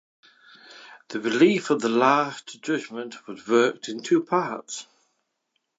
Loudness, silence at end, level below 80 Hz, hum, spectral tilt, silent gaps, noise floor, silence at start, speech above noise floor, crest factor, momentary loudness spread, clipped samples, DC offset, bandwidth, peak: -23 LUFS; 0.95 s; -80 dBFS; none; -4.5 dB/octave; none; -76 dBFS; 0.7 s; 53 dB; 20 dB; 17 LU; under 0.1%; under 0.1%; 8 kHz; -6 dBFS